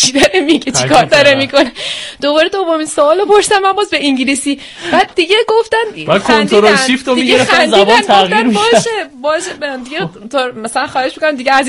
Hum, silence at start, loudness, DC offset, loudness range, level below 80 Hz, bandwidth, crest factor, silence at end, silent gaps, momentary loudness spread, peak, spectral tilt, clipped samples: none; 0 s; -11 LUFS; under 0.1%; 3 LU; -46 dBFS; 14.5 kHz; 10 dB; 0 s; none; 10 LU; 0 dBFS; -3 dB/octave; 0.3%